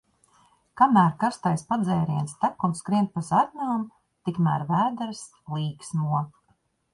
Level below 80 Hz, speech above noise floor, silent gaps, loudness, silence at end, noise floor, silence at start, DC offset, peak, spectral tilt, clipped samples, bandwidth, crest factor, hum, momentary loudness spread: -64 dBFS; 44 dB; none; -25 LUFS; 0.65 s; -68 dBFS; 0.75 s; under 0.1%; -6 dBFS; -7 dB/octave; under 0.1%; 11.5 kHz; 20 dB; none; 13 LU